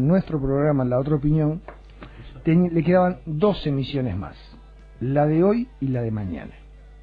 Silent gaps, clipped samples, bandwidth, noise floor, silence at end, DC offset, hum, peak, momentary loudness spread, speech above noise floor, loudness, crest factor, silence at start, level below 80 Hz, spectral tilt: none; under 0.1%; 5 kHz; -45 dBFS; 0 s; under 0.1%; none; -6 dBFS; 14 LU; 23 dB; -22 LUFS; 16 dB; 0 s; -42 dBFS; -10.5 dB/octave